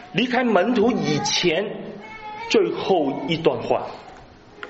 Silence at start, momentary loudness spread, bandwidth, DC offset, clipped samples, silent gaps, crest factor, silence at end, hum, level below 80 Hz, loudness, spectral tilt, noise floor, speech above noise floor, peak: 0 s; 16 LU; 8 kHz; under 0.1%; under 0.1%; none; 20 dB; 0 s; none; -56 dBFS; -21 LUFS; -3.5 dB/octave; -45 dBFS; 24 dB; -2 dBFS